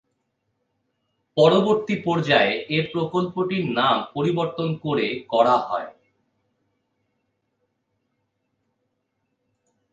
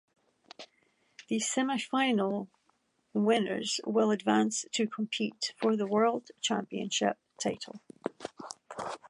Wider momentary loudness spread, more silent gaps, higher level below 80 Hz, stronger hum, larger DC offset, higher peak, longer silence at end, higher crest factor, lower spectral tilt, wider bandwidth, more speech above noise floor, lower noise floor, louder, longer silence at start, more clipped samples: second, 8 LU vs 15 LU; neither; first, -66 dBFS vs -80 dBFS; neither; neither; first, -2 dBFS vs -12 dBFS; first, 4.05 s vs 0 s; about the same, 22 dB vs 20 dB; first, -6.5 dB/octave vs -3.5 dB/octave; second, 9.2 kHz vs 11.5 kHz; first, 54 dB vs 43 dB; about the same, -75 dBFS vs -73 dBFS; first, -21 LUFS vs -31 LUFS; first, 1.35 s vs 0.6 s; neither